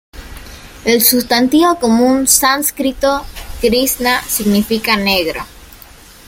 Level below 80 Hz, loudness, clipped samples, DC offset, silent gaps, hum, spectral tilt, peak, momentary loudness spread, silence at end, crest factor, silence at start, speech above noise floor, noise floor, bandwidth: -36 dBFS; -13 LUFS; under 0.1%; under 0.1%; none; none; -2.5 dB/octave; 0 dBFS; 16 LU; 0.55 s; 14 dB; 0.15 s; 26 dB; -39 dBFS; 17 kHz